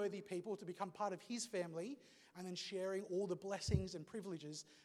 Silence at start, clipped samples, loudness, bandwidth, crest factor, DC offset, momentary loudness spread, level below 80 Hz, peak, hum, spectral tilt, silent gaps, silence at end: 0 s; under 0.1%; -45 LUFS; 15 kHz; 24 dB; under 0.1%; 9 LU; -60 dBFS; -22 dBFS; none; -5 dB/octave; none; 0 s